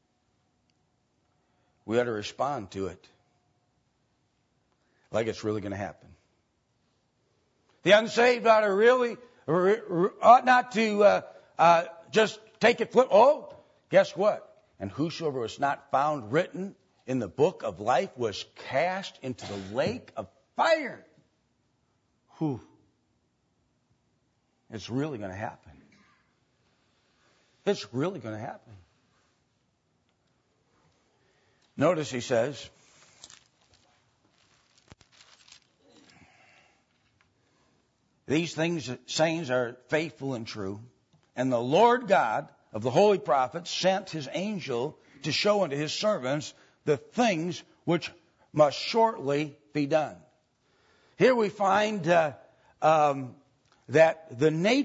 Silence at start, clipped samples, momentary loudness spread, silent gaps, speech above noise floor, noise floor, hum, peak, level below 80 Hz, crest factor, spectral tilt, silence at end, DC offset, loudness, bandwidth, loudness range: 1.85 s; under 0.1%; 16 LU; none; 47 dB; -73 dBFS; none; -4 dBFS; -72 dBFS; 24 dB; -5 dB/octave; 0 s; under 0.1%; -26 LUFS; 8 kHz; 15 LU